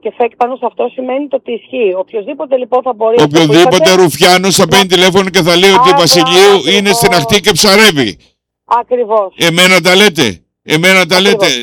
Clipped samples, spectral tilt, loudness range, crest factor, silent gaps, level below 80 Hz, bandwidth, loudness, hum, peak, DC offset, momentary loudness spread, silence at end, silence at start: 0.5%; -3.5 dB/octave; 5 LU; 8 dB; none; -44 dBFS; 19.5 kHz; -8 LUFS; none; 0 dBFS; under 0.1%; 11 LU; 0 s; 0.05 s